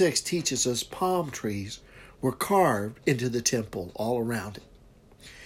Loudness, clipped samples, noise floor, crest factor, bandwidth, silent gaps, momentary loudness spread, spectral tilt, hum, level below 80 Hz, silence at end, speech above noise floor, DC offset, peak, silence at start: -28 LUFS; under 0.1%; -54 dBFS; 20 dB; 16 kHz; none; 12 LU; -4 dB/octave; none; -56 dBFS; 0 s; 27 dB; under 0.1%; -8 dBFS; 0 s